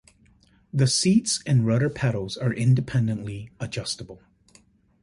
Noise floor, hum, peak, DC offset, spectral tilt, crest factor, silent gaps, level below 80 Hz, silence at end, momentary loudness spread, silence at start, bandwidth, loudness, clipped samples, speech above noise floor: -59 dBFS; none; -8 dBFS; under 0.1%; -5 dB/octave; 16 dB; none; -54 dBFS; 0.9 s; 13 LU; 0.75 s; 11.5 kHz; -24 LUFS; under 0.1%; 36 dB